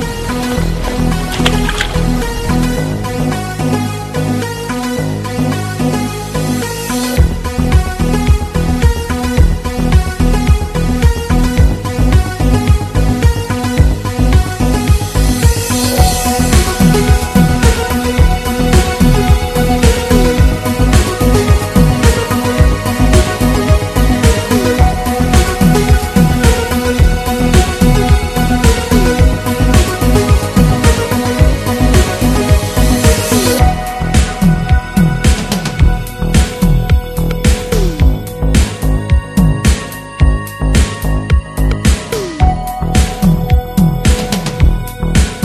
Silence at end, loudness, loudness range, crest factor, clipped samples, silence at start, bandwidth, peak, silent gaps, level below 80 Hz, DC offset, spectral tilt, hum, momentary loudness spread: 0 s; -13 LUFS; 4 LU; 10 dB; 0.7%; 0 s; 14 kHz; 0 dBFS; none; -14 dBFS; under 0.1%; -5.5 dB/octave; none; 6 LU